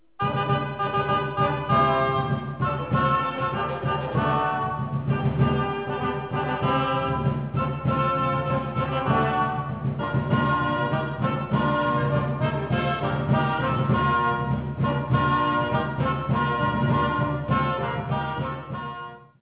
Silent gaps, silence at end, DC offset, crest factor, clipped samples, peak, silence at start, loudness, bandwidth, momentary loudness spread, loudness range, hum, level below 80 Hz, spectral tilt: none; 0.2 s; 0.2%; 16 dB; under 0.1%; -8 dBFS; 0.2 s; -24 LUFS; 4 kHz; 5 LU; 2 LU; none; -44 dBFS; -11 dB/octave